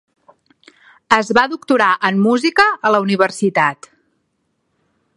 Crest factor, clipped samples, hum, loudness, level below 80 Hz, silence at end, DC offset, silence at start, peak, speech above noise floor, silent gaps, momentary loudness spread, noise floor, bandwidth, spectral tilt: 18 dB; under 0.1%; none; -15 LUFS; -58 dBFS; 1.45 s; under 0.1%; 1.1 s; 0 dBFS; 53 dB; none; 4 LU; -68 dBFS; 11.5 kHz; -5 dB/octave